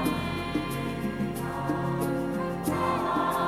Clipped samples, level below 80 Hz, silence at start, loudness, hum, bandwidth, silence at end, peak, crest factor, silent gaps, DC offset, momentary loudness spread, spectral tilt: under 0.1%; -48 dBFS; 0 s; -29 LUFS; none; 18 kHz; 0 s; -14 dBFS; 14 dB; none; under 0.1%; 5 LU; -6 dB/octave